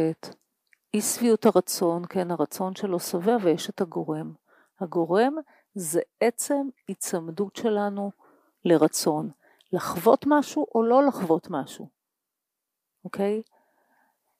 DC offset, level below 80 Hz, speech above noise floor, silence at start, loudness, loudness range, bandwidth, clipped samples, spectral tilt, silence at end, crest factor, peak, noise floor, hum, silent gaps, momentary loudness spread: under 0.1%; -74 dBFS; 60 dB; 0 s; -25 LUFS; 4 LU; 15.5 kHz; under 0.1%; -5 dB/octave; 1 s; 20 dB; -6 dBFS; -85 dBFS; none; none; 14 LU